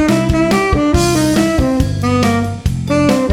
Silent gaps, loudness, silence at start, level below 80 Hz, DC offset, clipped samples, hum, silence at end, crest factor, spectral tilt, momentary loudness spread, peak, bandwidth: none; -14 LUFS; 0 s; -24 dBFS; under 0.1%; under 0.1%; none; 0 s; 12 dB; -6 dB/octave; 4 LU; 0 dBFS; 17.5 kHz